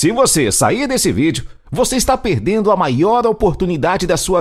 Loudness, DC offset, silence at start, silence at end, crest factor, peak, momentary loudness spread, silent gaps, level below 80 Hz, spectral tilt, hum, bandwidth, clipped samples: -15 LUFS; under 0.1%; 0 s; 0 s; 14 dB; 0 dBFS; 5 LU; none; -34 dBFS; -4.5 dB/octave; none; 16 kHz; under 0.1%